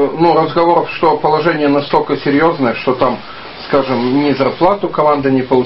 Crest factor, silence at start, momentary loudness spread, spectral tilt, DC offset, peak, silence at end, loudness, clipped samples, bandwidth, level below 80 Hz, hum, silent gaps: 12 dB; 0 s; 4 LU; -9 dB/octave; 0.5%; 0 dBFS; 0 s; -13 LUFS; under 0.1%; 5.8 kHz; -46 dBFS; none; none